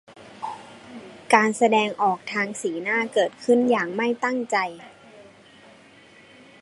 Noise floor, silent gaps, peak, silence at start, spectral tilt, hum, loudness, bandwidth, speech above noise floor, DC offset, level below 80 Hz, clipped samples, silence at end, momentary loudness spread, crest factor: -51 dBFS; none; -2 dBFS; 0.15 s; -4 dB/octave; none; -22 LUFS; 11.5 kHz; 29 dB; under 0.1%; -74 dBFS; under 0.1%; 1.4 s; 22 LU; 24 dB